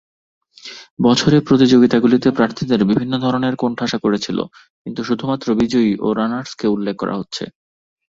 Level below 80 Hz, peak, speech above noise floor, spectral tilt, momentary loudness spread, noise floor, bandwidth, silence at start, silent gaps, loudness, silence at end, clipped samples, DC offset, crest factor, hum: -52 dBFS; -2 dBFS; 22 dB; -6 dB/octave; 17 LU; -38 dBFS; 7.6 kHz; 0.65 s; 0.90-0.97 s, 4.70-4.85 s; -17 LUFS; 0.6 s; under 0.1%; under 0.1%; 16 dB; none